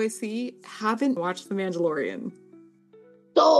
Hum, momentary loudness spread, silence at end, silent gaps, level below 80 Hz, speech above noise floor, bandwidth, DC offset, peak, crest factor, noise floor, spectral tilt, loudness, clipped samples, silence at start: none; 10 LU; 0 s; none; -78 dBFS; 26 dB; 12.5 kHz; under 0.1%; -6 dBFS; 20 dB; -54 dBFS; -5 dB/octave; -27 LUFS; under 0.1%; 0 s